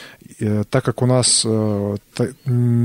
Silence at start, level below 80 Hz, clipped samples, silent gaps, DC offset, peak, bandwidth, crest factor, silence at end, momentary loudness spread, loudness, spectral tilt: 0 s; -54 dBFS; under 0.1%; none; under 0.1%; -4 dBFS; 12 kHz; 14 dB; 0 s; 10 LU; -18 LUFS; -4.5 dB/octave